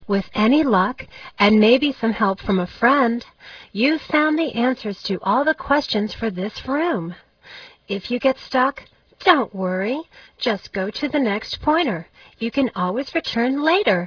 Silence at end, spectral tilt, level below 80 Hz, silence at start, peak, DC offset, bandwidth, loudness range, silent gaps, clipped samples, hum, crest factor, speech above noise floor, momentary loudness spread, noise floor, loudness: 0 s; -6.5 dB/octave; -50 dBFS; 0 s; 0 dBFS; under 0.1%; 5.4 kHz; 5 LU; none; under 0.1%; none; 20 dB; 23 dB; 12 LU; -43 dBFS; -20 LUFS